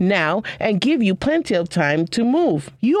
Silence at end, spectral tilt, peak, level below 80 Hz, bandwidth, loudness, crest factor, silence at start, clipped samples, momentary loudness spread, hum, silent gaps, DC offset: 0 s; -6 dB/octave; -6 dBFS; -50 dBFS; 11.5 kHz; -19 LUFS; 14 dB; 0 s; under 0.1%; 4 LU; none; none; under 0.1%